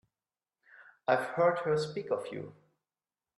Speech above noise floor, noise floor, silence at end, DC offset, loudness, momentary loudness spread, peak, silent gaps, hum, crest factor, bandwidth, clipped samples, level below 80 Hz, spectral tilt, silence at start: over 59 dB; under -90 dBFS; 0.85 s; under 0.1%; -32 LUFS; 15 LU; -14 dBFS; none; none; 20 dB; 12 kHz; under 0.1%; -78 dBFS; -6 dB/octave; 0.8 s